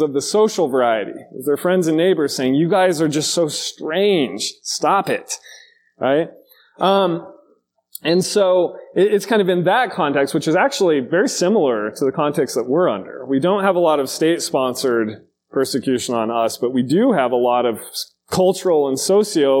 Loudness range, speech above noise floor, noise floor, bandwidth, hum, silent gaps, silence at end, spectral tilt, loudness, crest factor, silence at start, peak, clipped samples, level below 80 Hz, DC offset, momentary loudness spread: 3 LU; 42 dB; -59 dBFS; 17 kHz; none; none; 0 s; -4.5 dB/octave; -18 LUFS; 16 dB; 0 s; -2 dBFS; under 0.1%; -66 dBFS; under 0.1%; 8 LU